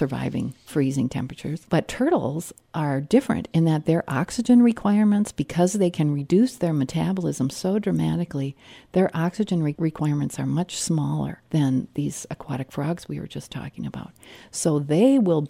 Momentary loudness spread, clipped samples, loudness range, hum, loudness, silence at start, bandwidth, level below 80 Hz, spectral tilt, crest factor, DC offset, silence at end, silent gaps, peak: 13 LU; under 0.1%; 6 LU; none; -23 LUFS; 0 s; 15.5 kHz; -54 dBFS; -6.5 dB/octave; 18 dB; under 0.1%; 0 s; none; -6 dBFS